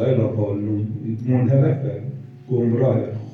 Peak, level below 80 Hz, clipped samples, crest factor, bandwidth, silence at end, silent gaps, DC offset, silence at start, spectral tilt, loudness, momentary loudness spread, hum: -4 dBFS; -58 dBFS; under 0.1%; 16 dB; 3.9 kHz; 0 s; none; under 0.1%; 0 s; -11.5 dB/octave; -21 LUFS; 10 LU; none